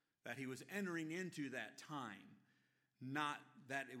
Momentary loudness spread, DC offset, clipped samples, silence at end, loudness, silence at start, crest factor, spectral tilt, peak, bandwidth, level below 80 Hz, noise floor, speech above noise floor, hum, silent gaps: 10 LU; under 0.1%; under 0.1%; 0 s; -48 LUFS; 0.25 s; 22 dB; -4.5 dB/octave; -28 dBFS; 16 kHz; under -90 dBFS; -81 dBFS; 34 dB; none; none